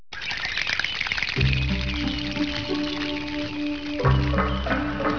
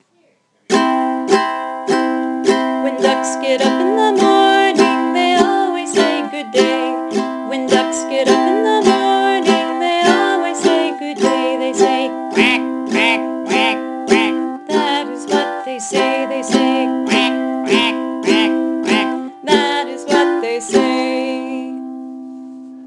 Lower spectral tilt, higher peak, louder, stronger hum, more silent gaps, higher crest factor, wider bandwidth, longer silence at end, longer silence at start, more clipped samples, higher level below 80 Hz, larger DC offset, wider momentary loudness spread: first, -5.5 dB/octave vs -3.5 dB/octave; second, -8 dBFS vs 0 dBFS; second, -25 LUFS vs -15 LUFS; neither; neither; about the same, 18 dB vs 16 dB; second, 5.4 kHz vs 12 kHz; about the same, 0 s vs 0 s; second, 0.1 s vs 0.7 s; neither; first, -32 dBFS vs -62 dBFS; first, 0.8% vs under 0.1%; about the same, 6 LU vs 8 LU